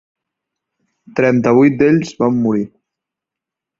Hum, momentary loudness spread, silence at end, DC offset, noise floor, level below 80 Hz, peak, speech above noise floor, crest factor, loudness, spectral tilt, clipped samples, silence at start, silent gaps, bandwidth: none; 11 LU; 1.1 s; under 0.1%; -84 dBFS; -54 dBFS; -2 dBFS; 71 dB; 16 dB; -14 LUFS; -8 dB/octave; under 0.1%; 1.15 s; none; 7.6 kHz